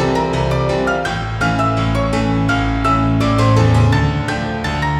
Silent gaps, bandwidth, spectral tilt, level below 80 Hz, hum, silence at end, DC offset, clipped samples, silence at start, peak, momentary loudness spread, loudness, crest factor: none; 11 kHz; -6.5 dB/octave; -26 dBFS; none; 0 s; under 0.1%; under 0.1%; 0 s; -2 dBFS; 7 LU; -16 LUFS; 14 dB